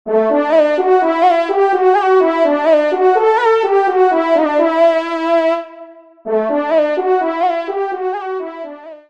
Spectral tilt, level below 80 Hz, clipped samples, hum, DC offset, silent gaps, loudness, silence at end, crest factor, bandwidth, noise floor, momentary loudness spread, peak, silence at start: -5 dB/octave; -68 dBFS; under 0.1%; none; 0.2%; none; -14 LUFS; 0.15 s; 12 dB; 8.2 kHz; -38 dBFS; 9 LU; -2 dBFS; 0.05 s